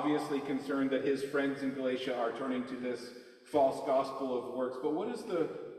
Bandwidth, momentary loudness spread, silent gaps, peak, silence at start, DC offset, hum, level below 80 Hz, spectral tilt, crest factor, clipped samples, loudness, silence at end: 13 kHz; 8 LU; none; -16 dBFS; 0 s; under 0.1%; none; -76 dBFS; -5.5 dB/octave; 18 dB; under 0.1%; -34 LUFS; 0 s